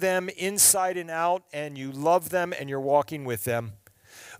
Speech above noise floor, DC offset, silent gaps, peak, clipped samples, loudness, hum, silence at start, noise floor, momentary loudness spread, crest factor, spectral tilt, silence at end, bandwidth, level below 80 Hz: 24 dB; under 0.1%; none; -8 dBFS; under 0.1%; -25 LUFS; none; 0 s; -50 dBFS; 14 LU; 18 dB; -2.5 dB/octave; 0.05 s; 16 kHz; -68 dBFS